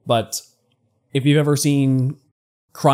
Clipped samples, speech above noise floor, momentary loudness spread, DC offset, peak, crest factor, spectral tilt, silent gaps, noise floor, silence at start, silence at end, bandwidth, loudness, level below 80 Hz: under 0.1%; 48 dB; 12 LU; under 0.1%; -4 dBFS; 16 dB; -5.5 dB/octave; 2.31-2.68 s; -65 dBFS; 0.05 s; 0 s; 16 kHz; -19 LUFS; -66 dBFS